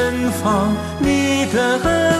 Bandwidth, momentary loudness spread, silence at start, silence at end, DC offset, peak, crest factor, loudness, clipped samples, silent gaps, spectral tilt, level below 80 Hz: 14 kHz; 3 LU; 0 s; 0 s; under 0.1%; -6 dBFS; 12 dB; -17 LUFS; under 0.1%; none; -5 dB/octave; -38 dBFS